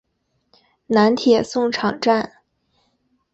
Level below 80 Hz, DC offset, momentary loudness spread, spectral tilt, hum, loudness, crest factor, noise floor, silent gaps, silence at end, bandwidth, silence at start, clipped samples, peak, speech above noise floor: -60 dBFS; under 0.1%; 6 LU; -5 dB/octave; none; -18 LUFS; 18 dB; -70 dBFS; none; 1.05 s; 8.2 kHz; 0.9 s; under 0.1%; -4 dBFS; 53 dB